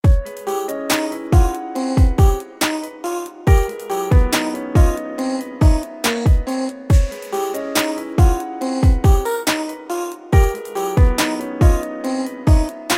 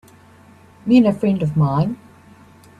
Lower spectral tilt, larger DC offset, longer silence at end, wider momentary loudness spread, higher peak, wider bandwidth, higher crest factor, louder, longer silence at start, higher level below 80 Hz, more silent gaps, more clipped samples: second, -5.5 dB/octave vs -9 dB/octave; neither; second, 0 s vs 0.85 s; second, 8 LU vs 14 LU; about the same, 0 dBFS vs -2 dBFS; first, 16.5 kHz vs 11.5 kHz; about the same, 16 dB vs 18 dB; about the same, -19 LUFS vs -17 LUFS; second, 0.05 s vs 0.85 s; first, -20 dBFS vs -52 dBFS; neither; neither